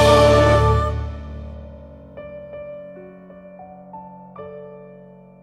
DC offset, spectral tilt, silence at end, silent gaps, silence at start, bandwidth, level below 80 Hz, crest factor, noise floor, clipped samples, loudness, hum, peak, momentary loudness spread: under 0.1%; -6 dB/octave; 0.65 s; none; 0 s; 14.5 kHz; -30 dBFS; 18 dB; -44 dBFS; under 0.1%; -16 LUFS; none; -4 dBFS; 27 LU